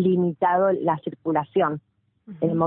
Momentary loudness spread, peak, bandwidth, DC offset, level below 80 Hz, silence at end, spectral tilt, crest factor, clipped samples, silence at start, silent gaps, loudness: 7 LU; -8 dBFS; 3.9 kHz; under 0.1%; -64 dBFS; 0 s; -12.5 dB/octave; 14 dB; under 0.1%; 0 s; none; -23 LUFS